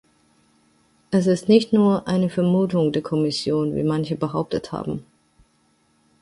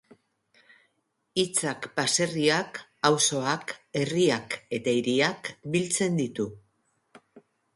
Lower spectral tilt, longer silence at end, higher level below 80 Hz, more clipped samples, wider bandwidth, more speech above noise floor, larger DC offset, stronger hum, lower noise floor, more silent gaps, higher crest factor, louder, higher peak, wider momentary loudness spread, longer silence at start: first, -7 dB/octave vs -3.5 dB/octave; first, 1.2 s vs 0.35 s; first, -56 dBFS vs -68 dBFS; neither; about the same, 11.5 kHz vs 11.5 kHz; second, 43 dB vs 48 dB; neither; neither; second, -63 dBFS vs -75 dBFS; neither; about the same, 18 dB vs 22 dB; first, -21 LUFS vs -26 LUFS; first, -4 dBFS vs -8 dBFS; about the same, 10 LU vs 9 LU; second, 1.1 s vs 1.35 s